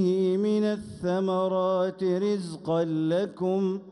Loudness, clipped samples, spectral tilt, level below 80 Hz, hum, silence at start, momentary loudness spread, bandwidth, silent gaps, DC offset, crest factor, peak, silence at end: -27 LUFS; under 0.1%; -7.5 dB/octave; -66 dBFS; none; 0 s; 5 LU; 11 kHz; none; under 0.1%; 10 dB; -16 dBFS; 0 s